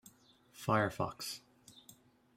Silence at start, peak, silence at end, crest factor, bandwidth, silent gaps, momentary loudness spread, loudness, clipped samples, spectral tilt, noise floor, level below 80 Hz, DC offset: 0.05 s; -18 dBFS; 0.45 s; 22 dB; 16 kHz; none; 24 LU; -37 LUFS; under 0.1%; -5 dB/octave; -65 dBFS; -70 dBFS; under 0.1%